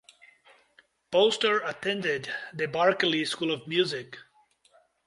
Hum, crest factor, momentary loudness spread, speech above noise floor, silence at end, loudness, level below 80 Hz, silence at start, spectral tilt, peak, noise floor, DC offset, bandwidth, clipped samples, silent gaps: none; 20 dB; 11 LU; 37 dB; 0.85 s; -27 LUFS; -72 dBFS; 1.1 s; -4 dB/octave; -10 dBFS; -64 dBFS; under 0.1%; 11.5 kHz; under 0.1%; none